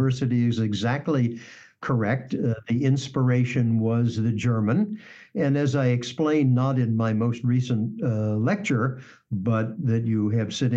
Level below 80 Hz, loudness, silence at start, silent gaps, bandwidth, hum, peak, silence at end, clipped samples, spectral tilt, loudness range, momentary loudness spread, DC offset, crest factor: -64 dBFS; -24 LUFS; 0 s; none; 7.8 kHz; none; -12 dBFS; 0 s; under 0.1%; -7.5 dB/octave; 2 LU; 5 LU; under 0.1%; 12 dB